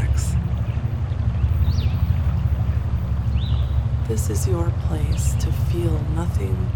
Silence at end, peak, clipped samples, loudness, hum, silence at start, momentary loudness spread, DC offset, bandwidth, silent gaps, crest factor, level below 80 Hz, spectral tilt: 0 s; -8 dBFS; under 0.1%; -22 LUFS; none; 0 s; 3 LU; under 0.1%; 17.5 kHz; none; 12 dB; -24 dBFS; -7 dB/octave